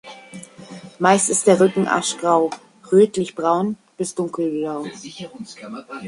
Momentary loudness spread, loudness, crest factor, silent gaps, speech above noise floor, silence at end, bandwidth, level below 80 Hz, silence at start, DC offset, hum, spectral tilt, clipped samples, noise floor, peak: 23 LU; -19 LUFS; 18 dB; none; 20 dB; 0 s; 11.5 kHz; -64 dBFS; 0.05 s; under 0.1%; none; -4.5 dB/octave; under 0.1%; -39 dBFS; -2 dBFS